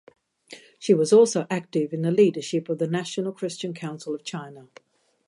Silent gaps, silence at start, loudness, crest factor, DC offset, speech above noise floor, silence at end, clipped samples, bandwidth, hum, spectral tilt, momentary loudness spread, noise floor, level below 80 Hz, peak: none; 0.5 s; -24 LUFS; 18 dB; under 0.1%; 25 dB; 0.65 s; under 0.1%; 11.5 kHz; none; -5.5 dB/octave; 16 LU; -49 dBFS; -78 dBFS; -6 dBFS